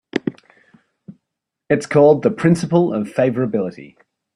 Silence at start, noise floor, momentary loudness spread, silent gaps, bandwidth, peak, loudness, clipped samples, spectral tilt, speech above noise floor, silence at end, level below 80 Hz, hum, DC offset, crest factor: 0.15 s; -80 dBFS; 12 LU; none; 11.5 kHz; -2 dBFS; -17 LUFS; under 0.1%; -7.5 dB/octave; 64 dB; 0.5 s; -58 dBFS; none; under 0.1%; 16 dB